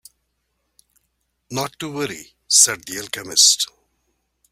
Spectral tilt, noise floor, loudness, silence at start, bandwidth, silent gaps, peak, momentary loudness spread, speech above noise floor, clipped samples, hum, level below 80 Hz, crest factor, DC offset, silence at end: 0 dB/octave; -72 dBFS; -17 LUFS; 1.5 s; 16.5 kHz; none; 0 dBFS; 15 LU; 53 dB; under 0.1%; none; -64 dBFS; 22 dB; under 0.1%; 0.85 s